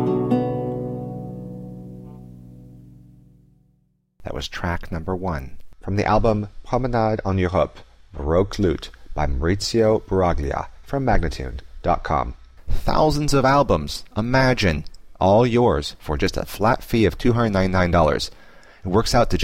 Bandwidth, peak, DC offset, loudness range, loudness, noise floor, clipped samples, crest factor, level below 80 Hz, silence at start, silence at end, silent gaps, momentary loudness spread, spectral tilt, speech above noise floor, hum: 16 kHz; -6 dBFS; under 0.1%; 13 LU; -21 LUFS; -64 dBFS; under 0.1%; 16 dB; -32 dBFS; 0 s; 0 s; none; 16 LU; -6 dB/octave; 45 dB; none